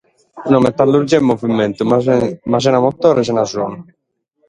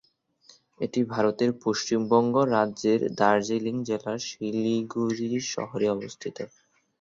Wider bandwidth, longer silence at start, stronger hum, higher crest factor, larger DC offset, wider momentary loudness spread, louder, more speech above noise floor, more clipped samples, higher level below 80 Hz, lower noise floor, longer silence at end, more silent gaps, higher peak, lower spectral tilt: first, 10.5 kHz vs 7.8 kHz; second, 0.35 s vs 0.8 s; neither; second, 14 dB vs 20 dB; neither; about the same, 8 LU vs 10 LU; first, -14 LUFS vs -26 LUFS; first, 53 dB vs 34 dB; neither; first, -50 dBFS vs -68 dBFS; first, -67 dBFS vs -59 dBFS; about the same, 0.65 s vs 0.55 s; neither; first, 0 dBFS vs -6 dBFS; first, -6.5 dB/octave vs -5 dB/octave